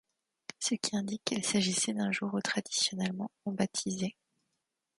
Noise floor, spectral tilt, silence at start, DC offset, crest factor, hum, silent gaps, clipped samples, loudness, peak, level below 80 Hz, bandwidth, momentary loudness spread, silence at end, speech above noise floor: -84 dBFS; -3 dB/octave; 0.6 s; under 0.1%; 22 dB; none; none; under 0.1%; -32 LUFS; -12 dBFS; -74 dBFS; 11.5 kHz; 9 LU; 0.9 s; 51 dB